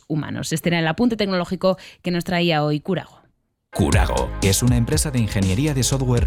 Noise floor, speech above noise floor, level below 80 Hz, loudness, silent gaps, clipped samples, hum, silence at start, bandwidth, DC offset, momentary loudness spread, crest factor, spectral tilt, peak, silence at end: -63 dBFS; 43 dB; -30 dBFS; -21 LUFS; none; under 0.1%; none; 0.1 s; 16 kHz; under 0.1%; 7 LU; 14 dB; -5 dB/octave; -6 dBFS; 0 s